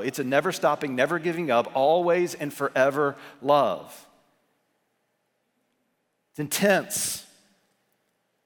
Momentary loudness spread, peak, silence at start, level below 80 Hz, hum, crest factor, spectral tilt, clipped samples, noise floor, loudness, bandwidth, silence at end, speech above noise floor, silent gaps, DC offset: 8 LU; -6 dBFS; 0 s; -74 dBFS; none; 20 dB; -4 dB/octave; under 0.1%; -75 dBFS; -24 LUFS; 19.5 kHz; 1.2 s; 50 dB; none; under 0.1%